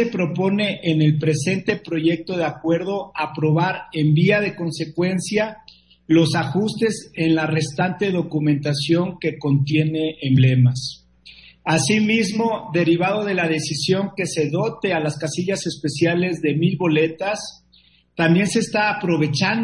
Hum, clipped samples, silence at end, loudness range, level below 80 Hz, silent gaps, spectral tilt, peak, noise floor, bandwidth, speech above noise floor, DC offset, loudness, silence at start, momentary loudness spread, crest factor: none; under 0.1%; 0 s; 2 LU; -58 dBFS; none; -6 dB/octave; -4 dBFS; -56 dBFS; 11.5 kHz; 36 dB; under 0.1%; -20 LUFS; 0 s; 7 LU; 16 dB